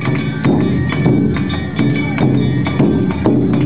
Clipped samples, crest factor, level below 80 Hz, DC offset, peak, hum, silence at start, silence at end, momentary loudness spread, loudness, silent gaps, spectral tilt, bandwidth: under 0.1%; 14 dB; -32 dBFS; 2%; 0 dBFS; none; 0 s; 0 s; 3 LU; -15 LUFS; none; -12 dB/octave; 4 kHz